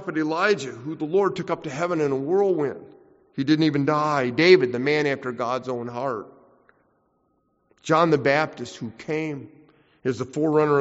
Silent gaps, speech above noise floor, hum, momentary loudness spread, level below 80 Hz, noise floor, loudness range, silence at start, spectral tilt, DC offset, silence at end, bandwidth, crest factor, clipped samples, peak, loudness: none; 46 dB; none; 13 LU; -66 dBFS; -68 dBFS; 5 LU; 0 s; -4.5 dB/octave; under 0.1%; 0 s; 8 kHz; 22 dB; under 0.1%; -2 dBFS; -23 LUFS